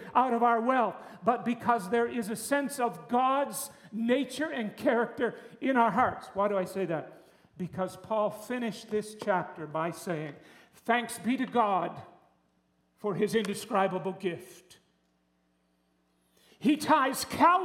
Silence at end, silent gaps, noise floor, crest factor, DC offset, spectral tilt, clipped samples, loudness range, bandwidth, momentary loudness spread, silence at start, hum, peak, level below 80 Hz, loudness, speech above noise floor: 0 s; none; -72 dBFS; 22 dB; under 0.1%; -5 dB/octave; under 0.1%; 5 LU; 17.5 kHz; 11 LU; 0 s; none; -10 dBFS; -72 dBFS; -30 LUFS; 43 dB